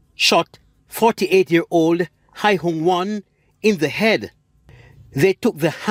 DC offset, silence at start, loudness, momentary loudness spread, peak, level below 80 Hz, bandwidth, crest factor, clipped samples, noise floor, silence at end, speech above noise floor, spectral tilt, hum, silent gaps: under 0.1%; 0.2 s; -18 LUFS; 12 LU; -2 dBFS; -58 dBFS; 16 kHz; 18 dB; under 0.1%; -48 dBFS; 0 s; 30 dB; -4.5 dB/octave; none; none